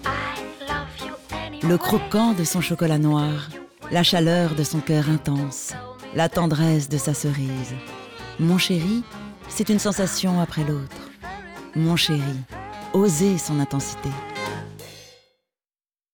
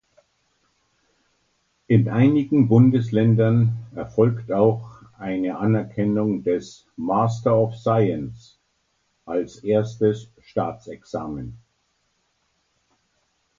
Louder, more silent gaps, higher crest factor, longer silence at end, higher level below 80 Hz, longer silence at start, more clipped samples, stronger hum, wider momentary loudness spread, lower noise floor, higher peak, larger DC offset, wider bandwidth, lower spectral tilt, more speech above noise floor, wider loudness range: about the same, -23 LUFS vs -21 LUFS; neither; about the same, 16 dB vs 18 dB; second, 1.05 s vs 2.05 s; first, -50 dBFS vs -56 dBFS; second, 0 s vs 1.9 s; neither; neither; about the same, 17 LU vs 15 LU; first, under -90 dBFS vs -70 dBFS; about the same, -6 dBFS vs -4 dBFS; neither; first, over 20 kHz vs 7.4 kHz; second, -5 dB/octave vs -9 dB/octave; first, over 69 dB vs 49 dB; second, 4 LU vs 8 LU